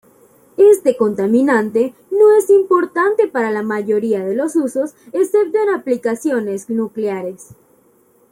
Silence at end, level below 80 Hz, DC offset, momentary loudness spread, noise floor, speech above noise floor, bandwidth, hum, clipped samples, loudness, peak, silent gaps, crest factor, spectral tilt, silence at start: 0.8 s; -66 dBFS; under 0.1%; 10 LU; -54 dBFS; 39 dB; 16 kHz; none; under 0.1%; -16 LUFS; -2 dBFS; none; 14 dB; -6 dB/octave; 0.6 s